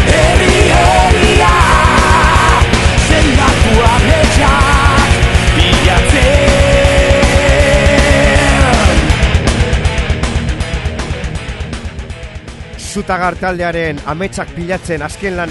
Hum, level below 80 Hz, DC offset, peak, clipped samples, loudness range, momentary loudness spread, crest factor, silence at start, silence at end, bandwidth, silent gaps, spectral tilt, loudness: none; -14 dBFS; under 0.1%; 0 dBFS; 0.6%; 10 LU; 13 LU; 10 dB; 0 s; 0 s; 12 kHz; none; -4.5 dB/octave; -10 LUFS